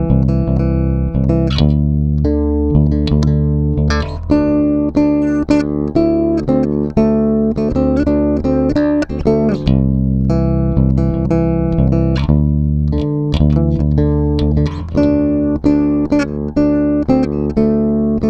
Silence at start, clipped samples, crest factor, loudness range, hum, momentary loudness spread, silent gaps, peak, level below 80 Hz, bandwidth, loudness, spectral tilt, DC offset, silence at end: 0 s; under 0.1%; 14 dB; 0 LU; none; 2 LU; none; 0 dBFS; -22 dBFS; 7.8 kHz; -14 LUFS; -9 dB/octave; under 0.1%; 0 s